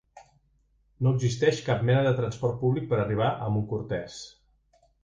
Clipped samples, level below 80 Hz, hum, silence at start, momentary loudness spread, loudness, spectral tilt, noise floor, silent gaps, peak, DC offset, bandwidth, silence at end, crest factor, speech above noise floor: under 0.1%; -54 dBFS; none; 0.15 s; 10 LU; -27 LUFS; -7 dB/octave; -67 dBFS; none; -10 dBFS; under 0.1%; 7.8 kHz; 0.75 s; 18 dB; 41 dB